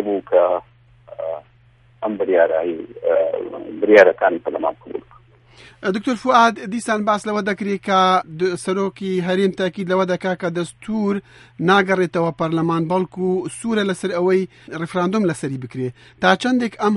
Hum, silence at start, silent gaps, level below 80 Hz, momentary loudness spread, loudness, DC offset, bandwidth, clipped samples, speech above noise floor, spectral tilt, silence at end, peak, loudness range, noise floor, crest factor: none; 0 s; none; -60 dBFS; 12 LU; -19 LUFS; under 0.1%; 11.5 kHz; under 0.1%; 34 dB; -6 dB/octave; 0 s; 0 dBFS; 4 LU; -52 dBFS; 20 dB